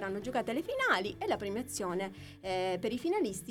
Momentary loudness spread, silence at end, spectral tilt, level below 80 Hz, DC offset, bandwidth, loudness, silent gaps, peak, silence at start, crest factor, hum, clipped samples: 7 LU; 0 s; -4 dB/octave; -62 dBFS; under 0.1%; 17.5 kHz; -34 LUFS; none; -16 dBFS; 0 s; 18 dB; none; under 0.1%